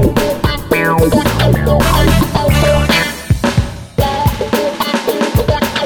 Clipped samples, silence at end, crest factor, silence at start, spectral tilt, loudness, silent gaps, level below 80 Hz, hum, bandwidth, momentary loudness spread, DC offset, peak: under 0.1%; 0 s; 12 dB; 0 s; -5.5 dB/octave; -13 LUFS; none; -22 dBFS; none; over 20 kHz; 5 LU; under 0.1%; 0 dBFS